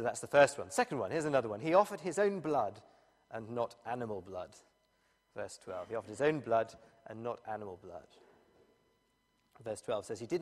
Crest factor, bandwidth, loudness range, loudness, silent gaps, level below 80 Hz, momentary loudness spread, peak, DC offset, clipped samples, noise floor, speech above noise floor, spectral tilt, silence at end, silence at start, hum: 24 dB; 14 kHz; 12 LU; -35 LUFS; none; -76 dBFS; 18 LU; -12 dBFS; under 0.1%; under 0.1%; -76 dBFS; 41 dB; -5 dB/octave; 0 s; 0 s; none